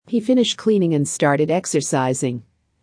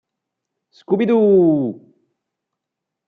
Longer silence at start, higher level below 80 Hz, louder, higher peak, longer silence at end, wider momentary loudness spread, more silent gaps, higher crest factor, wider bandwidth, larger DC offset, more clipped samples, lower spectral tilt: second, 0.1 s vs 0.9 s; about the same, -66 dBFS vs -68 dBFS; second, -19 LUFS vs -16 LUFS; about the same, -4 dBFS vs -6 dBFS; second, 0.4 s vs 1.35 s; second, 6 LU vs 10 LU; neither; about the same, 16 dB vs 14 dB; first, 10.5 kHz vs 4.7 kHz; neither; neither; second, -5 dB/octave vs -10.5 dB/octave